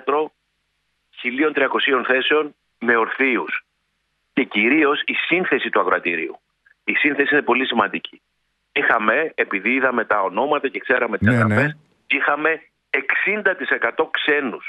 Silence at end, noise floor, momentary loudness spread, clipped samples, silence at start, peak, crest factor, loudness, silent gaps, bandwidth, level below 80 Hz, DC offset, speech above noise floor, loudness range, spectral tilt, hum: 0 s; -71 dBFS; 9 LU; under 0.1%; 0.05 s; -2 dBFS; 18 dB; -19 LUFS; none; 11 kHz; -62 dBFS; under 0.1%; 51 dB; 1 LU; -7 dB/octave; none